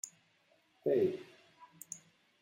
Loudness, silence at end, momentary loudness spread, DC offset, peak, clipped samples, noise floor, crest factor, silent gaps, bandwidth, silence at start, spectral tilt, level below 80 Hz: -37 LUFS; 0.45 s; 21 LU; under 0.1%; -20 dBFS; under 0.1%; -72 dBFS; 18 dB; none; 16 kHz; 0.05 s; -5.5 dB/octave; -82 dBFS